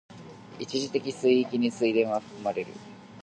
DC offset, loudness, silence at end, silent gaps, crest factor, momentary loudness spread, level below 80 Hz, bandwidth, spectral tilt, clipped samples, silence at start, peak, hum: under 0.1%; -27 LUFS; 0 s; none; 18 dB; 22 LU; -72 dBFS; 9.2 kHz; -5 dB/octave; under 0.1%; 0.1 s; -10 dBFS; none